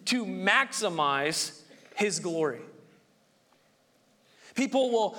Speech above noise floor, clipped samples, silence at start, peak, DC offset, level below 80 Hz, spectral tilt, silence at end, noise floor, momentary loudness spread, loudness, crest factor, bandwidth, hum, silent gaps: 38 dB; under 0.1%; 0 s; -8 dBFS; under 0.1%; -80 dBFS; -3 dB/octave; 0 s; -66 dBFS; 10 LU; -28 LUFS; 22 dB; 18.5 kHz; none; none